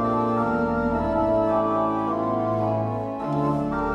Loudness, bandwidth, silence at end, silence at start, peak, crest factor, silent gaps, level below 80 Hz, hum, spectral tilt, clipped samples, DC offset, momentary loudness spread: -24 LUFS; 9.6 kHz; 0 s; 0 s; -10 dBFS; 12 dB; none; -44 dBFS; none; -9.5 dB/octave; under 0.1%; under 0.1%; 4 LU